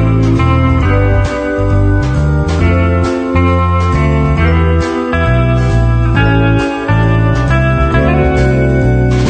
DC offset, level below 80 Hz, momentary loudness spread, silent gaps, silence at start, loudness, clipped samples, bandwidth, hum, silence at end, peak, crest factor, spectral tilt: under 0.1%; -16 dBFS; 3 LU; none; 0 s; -11 LUFS; under 0.1%; 9 kHz; none; 0 s; 0 dBFS; 10 dB; -8 dB/octave